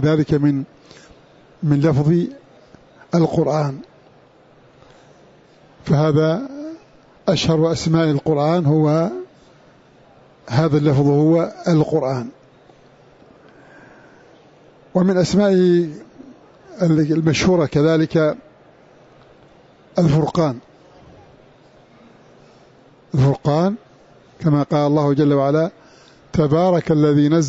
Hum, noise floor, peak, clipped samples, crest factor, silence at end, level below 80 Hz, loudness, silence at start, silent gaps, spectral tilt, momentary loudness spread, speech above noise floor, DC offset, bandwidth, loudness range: none; -50 dBFS; -4 dBFS; under 0.1%; 16 dB; 0 s; -48 dBFS; -17 LUFS; 0 s; none; -7.5 dB/octave; 11 LU; 34 dB; under 0.1%; 8 kHz; 6 LU